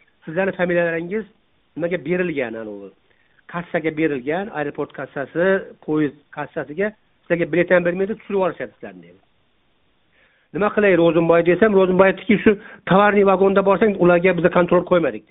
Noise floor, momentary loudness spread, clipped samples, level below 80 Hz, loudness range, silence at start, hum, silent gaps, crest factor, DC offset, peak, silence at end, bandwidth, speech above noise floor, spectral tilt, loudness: -64 dBFS; 14 LU; under 0.1%; -54 dBFS; 9 LU; 0.25 s; none; none; 18 dB; under 0.1%; 0 dBFS; 0.1 s; 4 kHz; 46 dB; -5.5 dB/octave; -19 LUFS